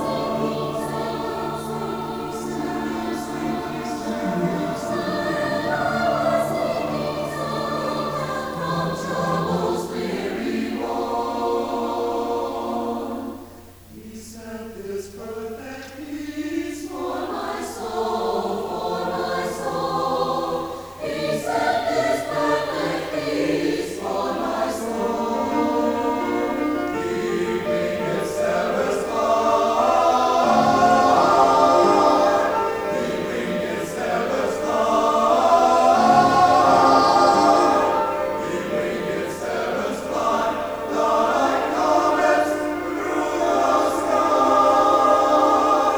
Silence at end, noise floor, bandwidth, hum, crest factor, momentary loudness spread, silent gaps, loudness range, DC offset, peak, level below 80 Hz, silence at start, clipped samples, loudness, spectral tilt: 0 s; -43 dBFS; over 20 kHz; none; 18 dB; 12 LU; none; 11 LU; under 0.1%; -4 dBFS; -52 dBFS; 0 s; under 0.1%; -21 LUFS; -5 dB/octave